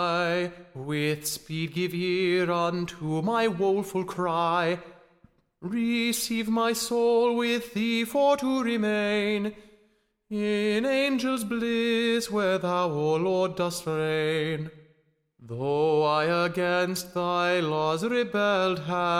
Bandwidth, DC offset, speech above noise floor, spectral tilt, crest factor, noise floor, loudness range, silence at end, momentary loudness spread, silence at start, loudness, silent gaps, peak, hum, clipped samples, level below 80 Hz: 16.5 kHz; under 0.1%; 41 dB; -5 dB/octave; 14 dB; -67 dBFS; 3 LU; 0 s; 8 LU; 0 s; -26 LUFS; none; -12 dBFS; none; under 0.1%; -62 dBFS